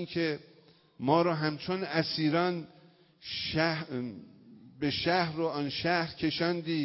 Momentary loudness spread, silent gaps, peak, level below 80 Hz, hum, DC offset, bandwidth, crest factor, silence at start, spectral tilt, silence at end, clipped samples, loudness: 11 LU; none; -12 dBFS; -62 dBFS; none; under 0.1%; 5.8 kHz; 20 dB; 0 s; -9 dB/octave; 0 s; under 0.1%; -31 LUFS